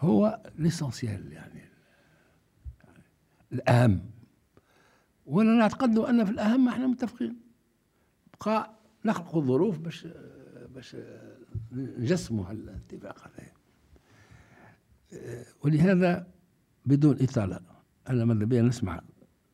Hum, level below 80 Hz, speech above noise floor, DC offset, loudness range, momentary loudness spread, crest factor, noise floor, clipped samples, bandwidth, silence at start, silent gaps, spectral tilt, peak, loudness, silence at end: none; -60 dBFS; 43 dB; under 0.1%; 10 LU; 24 LU; 22 dB; -69 dBFS; under 0.1%; 13 kHz; 0 s; none; -7.5 dB/octave; -6 dBFS; -27 LUFS; 0.55 s